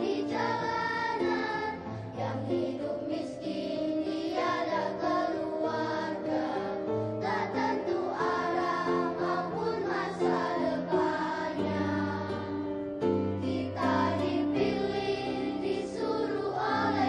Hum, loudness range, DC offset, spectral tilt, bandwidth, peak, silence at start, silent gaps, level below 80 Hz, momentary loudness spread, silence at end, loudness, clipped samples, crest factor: none; 2 LU; under 0.1%; -6.5 dB/octave; 10 kHz; -16 dBFS; 0 s; none; -62 dBFS; 5 LU; 0 s; -31 LUFS; under 0.1%; 16 dB